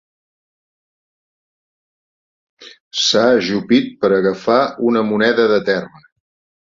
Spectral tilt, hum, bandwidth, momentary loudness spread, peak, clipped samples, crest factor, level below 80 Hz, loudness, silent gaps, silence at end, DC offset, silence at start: -4 dB/octave; none; 7.8 kHz; 4 LU; -2 dBFS; under 0.1%; 18 dB; -60 dBFS; -15 LUFS; 2.80-2.91 s; 0.8 s; under 0.1%; 2.6 s